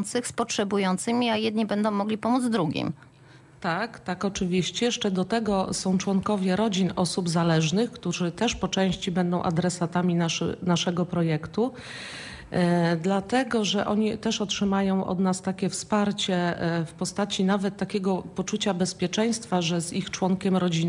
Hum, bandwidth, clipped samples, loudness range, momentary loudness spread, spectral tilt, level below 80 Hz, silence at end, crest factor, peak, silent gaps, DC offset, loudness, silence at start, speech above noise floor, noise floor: none; 11.5 kHz; under 0.1%; 2 LU; 5 LU; -5 dB/octave; -56 dBFS; 0 s; 14 dB; -12 dBFS; none; under 0.1%; -26 LUFS; 0 s; 26 dB; -52 dBFS